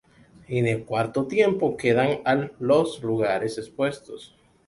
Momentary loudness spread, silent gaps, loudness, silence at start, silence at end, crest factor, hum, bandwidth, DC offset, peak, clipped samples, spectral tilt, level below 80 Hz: 9 LU; none; -24 LUFS; 0.5 s; 0.4 s; 18 dB; none; 11.5 kHz; under 0.1%; -6 dBFS; under 0.1%; -6.5 dB/octave; -60 dBFS